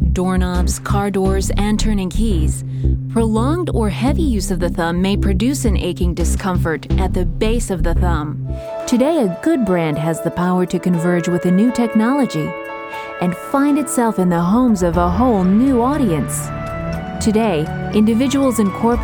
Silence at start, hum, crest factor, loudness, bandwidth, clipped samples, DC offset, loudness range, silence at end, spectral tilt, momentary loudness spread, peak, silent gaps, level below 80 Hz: 0 s; none; 14 dB; -17 LUFS; 19.5 kHz; under 0.1%; under 0.1%; 3 LU; 0 s; -6.5 dB/octave; 7 LU; -2 dBFS; none; -24 dBFS